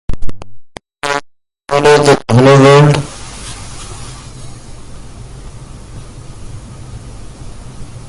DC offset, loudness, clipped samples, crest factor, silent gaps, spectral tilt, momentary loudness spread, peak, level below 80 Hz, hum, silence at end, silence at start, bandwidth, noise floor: under 0.1%; -9 LUFS; 0.3%; 14 dB; none; -6 dB/octave; 26 LU; 0 dBFS; -32 dBFS; none; 0 s; 0.1 s; 11.5 kHz; -40 dBFS